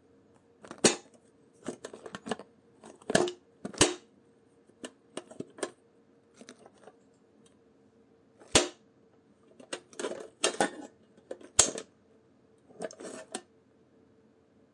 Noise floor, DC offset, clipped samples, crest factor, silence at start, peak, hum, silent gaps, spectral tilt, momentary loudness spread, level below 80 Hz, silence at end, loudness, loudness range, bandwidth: -64 dBFS; under 0.1%; under 0.1%; 34 dB; 0.65 s; -4 dBFS; none; none; -2 dB/octave; 22 LU; -62 dBFS; 1.35 s; -31 LUFS; 15 LU; 11.5 kHz